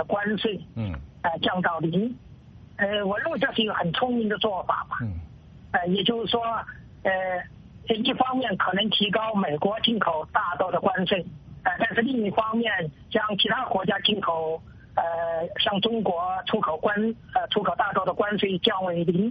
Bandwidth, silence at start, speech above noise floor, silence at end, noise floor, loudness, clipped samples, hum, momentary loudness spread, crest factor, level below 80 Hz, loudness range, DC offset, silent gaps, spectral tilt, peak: 5.2 kHz; 0 s; 22 dB; 0 s; -47 dBFS; -25 LUFS; under 0.1%; none; 8 LU; 18 dB; -54 dBFS; 3 LU; under 0.1%; none; -2.5 dB/octave; -8 dBFS